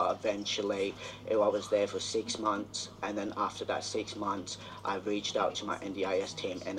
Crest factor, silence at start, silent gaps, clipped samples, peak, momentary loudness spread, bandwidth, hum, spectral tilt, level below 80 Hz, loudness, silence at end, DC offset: 18 dB; 0 s; none; under 0.1%; -14 dBFS; 7 LU; 12.5 kHz; none; -3.5 dB/octave; -66 dBFS; -34 LUFS; 0 s; under 0.1%